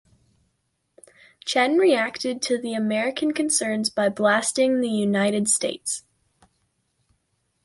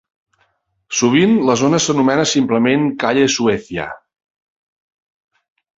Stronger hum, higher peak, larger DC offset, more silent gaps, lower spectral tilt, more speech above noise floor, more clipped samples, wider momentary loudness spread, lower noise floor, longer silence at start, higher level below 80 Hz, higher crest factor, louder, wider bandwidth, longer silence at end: neither; second, -8 dBFS vs -2 dBFS; neither; neither; about the same, -3 dB/octave vs -4 dB/octave; about the same, 51 dB vs 49 dB; neither; about the same, 7 LU vs 9 LU; first, -73 dBFS vs -63 dBFS; first, 1.45 s vs 0.9 s; second, -68 dBFS vs -54 dBFS; about the same, 18 dB vs 16 dB; second, -22 LUFS vs -15 LUFS; first, 11.5 kHz vs 8 kHz; second, 1.65 s vs 1.8 s